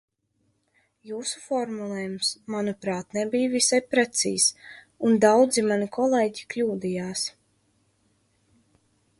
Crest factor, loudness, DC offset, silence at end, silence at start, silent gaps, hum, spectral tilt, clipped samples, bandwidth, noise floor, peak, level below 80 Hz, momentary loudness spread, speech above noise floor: 22 dB; -24 LUFS; under 0.1%; 1.9 s; 1.05 s; none; none; -3 dB/octave; under 0.1%; 11.5 kHz; -72 dBFS; -6 dBFS; -68 dBFS; 12 LU; 47 dB